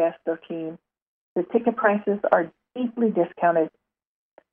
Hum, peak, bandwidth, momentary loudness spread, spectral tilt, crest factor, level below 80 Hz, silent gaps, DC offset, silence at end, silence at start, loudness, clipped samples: none; -4 dBFS; 3.6 kHz; 11 LU; -10 dB/octave; 22 dB; -76 dBFS; 1.02-1.36 s; under 0.1%; 0.85 s; 0 s; -24 LUFS; under 0.1%